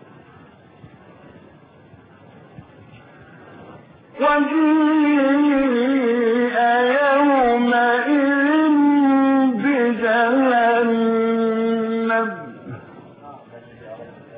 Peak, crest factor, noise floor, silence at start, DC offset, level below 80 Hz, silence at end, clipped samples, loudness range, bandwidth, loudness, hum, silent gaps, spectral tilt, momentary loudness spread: -8 dBFS; 12 dB; -47 dBFS; 2.6 s; under 0.1%; -58 dBFS; 0 s; under 0.1%; 6 LU; 4.8 kHz; -17 LUFS; none; none; -10.5 dB/octave; 10 LU